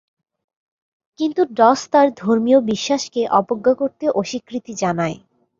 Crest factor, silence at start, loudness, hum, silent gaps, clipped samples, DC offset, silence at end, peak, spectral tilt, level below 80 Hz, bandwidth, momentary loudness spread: 18 dB; 1.2 s; -18 LUFS; none; none; under 0.1%; under 0.1%; 0.45 s; -2 dBFS; -5 dB/octave; -62 dBFS; 7.6 kHz; 10 LU